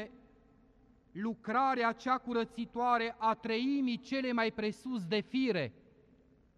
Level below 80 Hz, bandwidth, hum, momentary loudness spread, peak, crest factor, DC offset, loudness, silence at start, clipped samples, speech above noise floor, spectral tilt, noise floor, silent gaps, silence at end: -70 dBFS; 10.5 kHz; none; 9 LU; -18 dBFS; 16 dB; under 0.1%; -34 LUFS; 0 s; under 0.1%; 32 dB; -6 dB/octave; -65 dBFS; none; 0.85 s